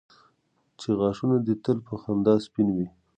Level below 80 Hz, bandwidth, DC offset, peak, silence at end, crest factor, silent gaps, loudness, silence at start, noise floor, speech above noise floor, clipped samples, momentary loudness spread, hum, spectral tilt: -58 dBFS; 9 kHz; under 0.1%; -8 dBFS; 0.3 s; 18 dB; none; -26 LUFS; 0.8 s; -71 dBFS; 46 dB; under 0.1%; 7 LU; none; -8.5 dB/octave